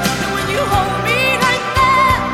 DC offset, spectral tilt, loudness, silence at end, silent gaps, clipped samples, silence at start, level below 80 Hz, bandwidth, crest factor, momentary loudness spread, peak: under 0.1%; -4 dB/octave; -14 LUFS; 0 s; none; under 0.1%; 0 s; -32 dBFS; 16.5 kHz; 12 dB; 6 LU; -2 dBFS